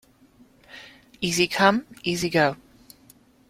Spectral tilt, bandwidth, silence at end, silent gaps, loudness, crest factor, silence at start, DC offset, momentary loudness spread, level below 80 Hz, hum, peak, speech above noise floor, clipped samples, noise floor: -4 dB/octave; 16.5 kHz; 0.95 s; none; -23 LUFS; 24 dB; 0.75 s; under 0.1%; 25 LU; -58 dBFS; none; -4 dBFS; 34 dB; under 0.1%; -56 dBFS